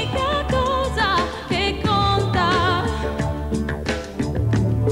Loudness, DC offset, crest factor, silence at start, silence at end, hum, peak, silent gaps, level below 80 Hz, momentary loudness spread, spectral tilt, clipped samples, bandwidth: -21 LUFS; under 0.1%; 14 dB; 0 s; 0 s; none; -6 dBFS; none; -32 dBFS; 7 LU; -6 dB/octave; under 0.1%; 12.5 kHz